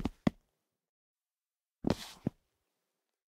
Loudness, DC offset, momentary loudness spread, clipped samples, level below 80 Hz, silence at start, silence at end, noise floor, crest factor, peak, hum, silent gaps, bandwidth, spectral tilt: -38 LUFS; under 0.1%; 6 LU; under 0.1%; -58 dBFS; 0 s; 1.05 s; under -90 dBFS; 30 dB; -12 dBFS; none; 0.89-1.16 s; 16 kHz; -6.5 dB/octave